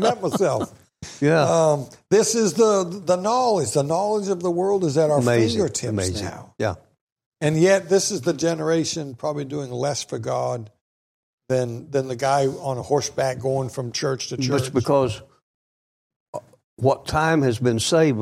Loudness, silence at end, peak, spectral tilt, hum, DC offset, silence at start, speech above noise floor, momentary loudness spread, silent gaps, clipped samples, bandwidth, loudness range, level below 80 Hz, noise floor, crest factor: -22 LUFS; 0 s; -6 dBFS; -5 dB/octave; none; under 0.1%; 0 s; over 69 dB; 10 LU; 7.01-7.16 s, 7.26-7.32 s, 10.81-11.38 s, 15.42-16.10 s, 16.16-16.33 s, 16.64-16.77 s; under 0.1%; 15.5 kHz; 6 LU; -54 dBFS; under -90 dBFS; 16 dB